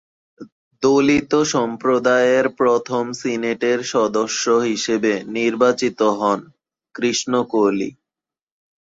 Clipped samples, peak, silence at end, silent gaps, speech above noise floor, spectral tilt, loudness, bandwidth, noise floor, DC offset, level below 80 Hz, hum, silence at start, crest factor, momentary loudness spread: under 0.1%; -4 dBFS; 0.9 s; 0.52-0.71 s; 71 dB; -4 dB/octave; -18 LUFS; 8 kHz; -89 dBFS; under 0.1%; -58 dBFS; none; 0.4 s; 16 dB; 7 LU